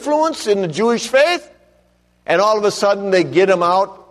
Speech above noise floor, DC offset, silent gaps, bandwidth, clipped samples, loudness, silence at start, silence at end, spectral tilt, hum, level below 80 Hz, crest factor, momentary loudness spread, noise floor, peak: 42 dB; under 0.1%; none; 13 kHz; under 0.1%; -16 LUFS; 0 s; 0.15 s; -4 dB/octave; 60 Hz at -55 dBFS; -60 dBFS; 14 dB; 5 LU; -57 dBFS; -2 dBFS